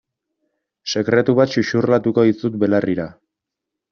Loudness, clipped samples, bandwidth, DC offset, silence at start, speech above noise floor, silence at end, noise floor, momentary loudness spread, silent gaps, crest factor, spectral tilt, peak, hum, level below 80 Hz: -18 LUFS; under 0.1%; 7 kHz; under 0.1%; 0.85 s; 66 dB; 0.8 s; -83 dBFS; 10 LU; none; 16 dB; -5.5 dB/octave; -2 dBFS; none; -58 dBFS